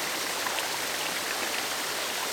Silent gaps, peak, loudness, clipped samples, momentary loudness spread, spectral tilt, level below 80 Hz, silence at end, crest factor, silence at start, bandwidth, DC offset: none; -14 dBFS; -29 LUFS; under 0.1%; 1 LU; 0 dB/octave; -68 dBFS; 0 s; 18 dB; 0 s; over 20 kHz; under 0.1%